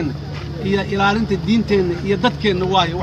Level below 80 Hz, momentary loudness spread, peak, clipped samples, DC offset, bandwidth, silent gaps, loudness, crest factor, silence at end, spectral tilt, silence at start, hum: -36 dBFS; 8 LU; -4 dBFS; under 0.1%; under 0.1%; 9 kHz; none; -18 LUFS; 14 dB; 0 s; -6.5 dB/octave; 0 s; none